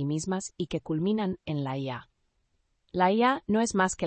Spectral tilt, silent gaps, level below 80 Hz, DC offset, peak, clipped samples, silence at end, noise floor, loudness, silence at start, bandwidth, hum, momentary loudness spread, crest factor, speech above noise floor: -5.5 dB/octave; none; -58 dBFS; under 0.1%; -12 dBFS; under 0.1%; 0 s; -73 dBFS; -28 LUFS; 0 s; 8.8 kHz; none; 10 LU; 18 dB; 45 dB